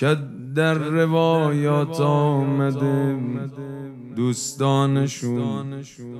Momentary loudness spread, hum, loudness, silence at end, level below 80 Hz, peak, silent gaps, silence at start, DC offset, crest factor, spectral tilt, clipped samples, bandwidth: 14 LU; none; -21 LUFS; 0 s; -66 dBFS; -6 dBFS; none; 0 s; under 0.1%; 16 dB; -6.5 dB/octave; under 0.1%; 13.5 kHz